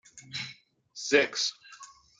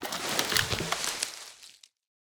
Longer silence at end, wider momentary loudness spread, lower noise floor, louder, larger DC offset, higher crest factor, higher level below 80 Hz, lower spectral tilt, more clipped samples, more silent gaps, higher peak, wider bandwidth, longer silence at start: second, 0.35 s vs 0.5 s; first, 24 LU vs 18 LU; about the same, -53 dBFS vs -55 dBFS; about the same, -29 LUFS vs -29 LUFS; neither; about the same, 24 dB vs 26 dB; second, -76 dBFS vs -56 dBFS; about the same, -1.5 dB/octave vs -1.5 dB/octave; neither; neither; about the same, -8 dBFS vs -8 dBFS; second, 9.4 kHz vs over 20 kHz; first, 0.15 s vs 0 s